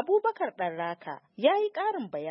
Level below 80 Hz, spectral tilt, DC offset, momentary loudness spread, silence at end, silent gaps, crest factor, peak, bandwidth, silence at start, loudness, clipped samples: -88 dBFS; -8.5 dB/octave; under 0.1%; 10 LU; 0 s; none; 18 dB; -12 dBFS; 5.8 kHz; 0 s; -29 LUFS; under 0.1%